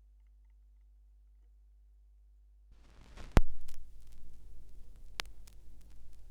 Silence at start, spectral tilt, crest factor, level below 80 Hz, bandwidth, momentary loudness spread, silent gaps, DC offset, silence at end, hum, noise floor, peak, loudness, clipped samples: 3.15 s; -5.5 dB/octave; 30 dB; -42 dBFS; 11.5 kHz; 31 LU; none; under 0.1%; 0.05 s; none; -61 dBFS; -4 dBFS; -38 LUFS; under 0.1%